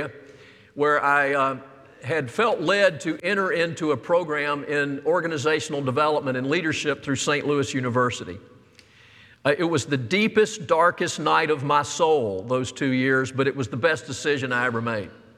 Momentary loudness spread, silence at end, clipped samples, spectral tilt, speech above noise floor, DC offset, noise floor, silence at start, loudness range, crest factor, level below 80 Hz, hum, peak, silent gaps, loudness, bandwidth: 7 LU; 0.25 s; under 0.1%; -4.5 dB/octave; 30 dB; under 0.1%; -53 dBFS; 0 s; 3 LU; 18 dB; -68 dBFS; none; -4 dBFS; none; -23 LUFS; 13 kHz